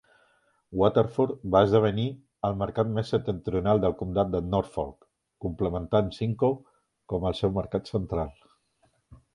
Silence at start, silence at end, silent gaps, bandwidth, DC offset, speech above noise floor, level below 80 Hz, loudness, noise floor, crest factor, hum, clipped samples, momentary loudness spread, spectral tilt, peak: 0.7 s; 0.2 s; none; 11 kHz; under 0.1%; 43 dB; -46 dBFS; -27 LUFS; -69 dBFS; 22 dB; none; under 0.1%; 11 LU; -8.5 dB/octave; -6 dBFS